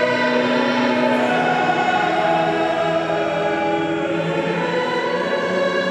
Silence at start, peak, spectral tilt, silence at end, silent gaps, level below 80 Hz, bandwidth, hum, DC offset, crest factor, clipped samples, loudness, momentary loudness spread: 0 s; -6 dBFS; -5.5 dB/octave; 0 s; none; -56 dBFS; 11 kHz; none; under 0.1%; 12 dB; under 0.1%; -19 LUFS; 3 LU